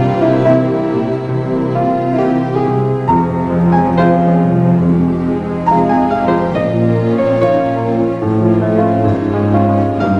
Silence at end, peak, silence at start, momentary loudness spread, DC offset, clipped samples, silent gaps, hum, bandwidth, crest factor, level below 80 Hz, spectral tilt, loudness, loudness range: 0 s; 0 dBFS; 0 s; 4 LU; under 0.1%; under 0.1%; none; none; 7 kHz; 12 dB; -36 dBFS; -9.5 dB/octave; -13 LUFS; 2 LU